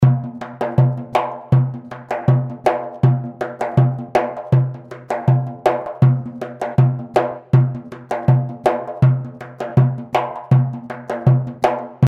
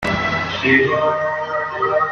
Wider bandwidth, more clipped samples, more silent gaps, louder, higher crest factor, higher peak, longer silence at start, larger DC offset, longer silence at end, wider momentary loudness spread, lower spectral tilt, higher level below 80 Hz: second, 5.6 kHz vs 11 kHz; neither; neither; about the same, -19 LUFS vs -17 LUFS; about the same, 16 dB vs 16 dB; about the same, -2 dBFS vs -2 dBFS; about the same, 0 s vs 0 s; neither; about the same, 0 s vs 0 s; first, 10 LU vs 7 LU; first, -9 dB/octave vs -5.5 dB/octave; about the same, -52 dBFS vs -48 dBFS